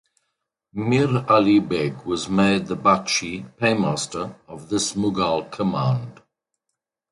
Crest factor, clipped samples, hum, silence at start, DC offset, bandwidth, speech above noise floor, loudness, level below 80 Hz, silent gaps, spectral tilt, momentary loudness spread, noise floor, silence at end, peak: 20 dB; under 0.1%; none; 0.75 s; under 0.1%; 11.5 kHz; 60 dB; -21 LUFS; -54 dBFS; none; -5 dB/octave; 12 LU; -81 dBFS; 1 s; -4 dBFS